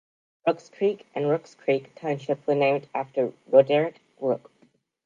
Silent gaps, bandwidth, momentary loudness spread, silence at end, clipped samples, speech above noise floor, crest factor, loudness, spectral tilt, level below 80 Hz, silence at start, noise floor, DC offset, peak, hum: none; 7.4 kHz; 10 LU; 0.7 s; under 0.1%; 39 dB; 22 dB; -25 LUFS; -7 dB/octave; -80 dBFS; 0.45 s; -63 dBFS; under 0.1%; -4 dBFS; none